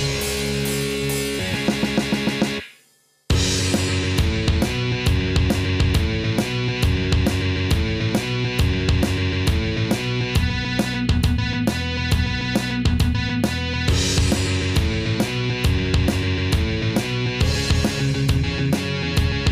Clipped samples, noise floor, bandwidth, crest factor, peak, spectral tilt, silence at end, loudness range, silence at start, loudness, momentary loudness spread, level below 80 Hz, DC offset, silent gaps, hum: under 0.1%; -59 dBFS; 16 kHz; 14 dB; -6 dBFS; -5 dB/octave; 0 s; 1 LU; 0 s; -21 LUFS; 3 LU; -28 dBFS; under 0.1%; none; none